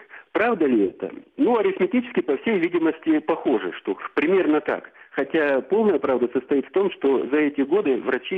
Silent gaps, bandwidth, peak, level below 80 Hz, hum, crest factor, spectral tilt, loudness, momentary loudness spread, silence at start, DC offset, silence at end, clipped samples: none; 4.6 kHz; -8 dBFS; -66 dBFS; none; 12 dB; -8 dB/octave; -22 LUFS; 8 LU; 0.15 s; under 0.1%; 0 s; under 0.1%